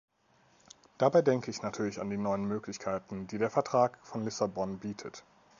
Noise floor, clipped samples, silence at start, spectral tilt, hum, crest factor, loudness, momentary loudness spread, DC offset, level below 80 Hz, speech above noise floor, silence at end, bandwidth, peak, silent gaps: -67 dBFS; under 0.1%; 1 s; -6 dB/octave; none; 20 dB; -32 LUFS; 13 LU; under 0.1%; -68 dBFS; 36 dB; 0.4 s; 7.4 kHz; -12 dBFS; none